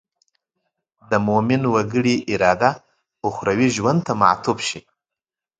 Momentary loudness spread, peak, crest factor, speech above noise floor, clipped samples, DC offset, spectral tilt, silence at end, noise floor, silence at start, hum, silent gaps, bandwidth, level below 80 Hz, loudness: 9 LU; 0 dBFS; 20 dB; 69 dB; under 0.1%; under 0.1%; -5.5 dB/octave; 0.8 s; -88 dBFS; 1.1 s; none; none; 9.2 kHz; -54 dBFS; -19 LUFS